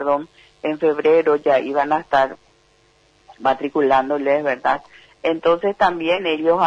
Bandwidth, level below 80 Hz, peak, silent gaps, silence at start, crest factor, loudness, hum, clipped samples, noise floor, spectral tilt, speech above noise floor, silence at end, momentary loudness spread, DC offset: 7.6 kHz; -56 dBFS; -4 dBFS; none; 0 s; 14 dB; -19 LUFS; none; under 0.1%; -57 dBFS; -6 dB/octave; 39 dB; 0 s; 8 LU; under 0.1%